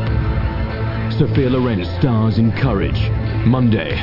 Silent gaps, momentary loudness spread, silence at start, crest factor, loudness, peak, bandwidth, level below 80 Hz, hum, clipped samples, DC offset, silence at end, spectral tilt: none; 6 LU; 0 s; 12 dB; -17 LUFS; -4 dBFS; 5.8 kHz; -26 dBFS; none; under 0.1%; under 0.1%; 0 s; -9.5 dB/octave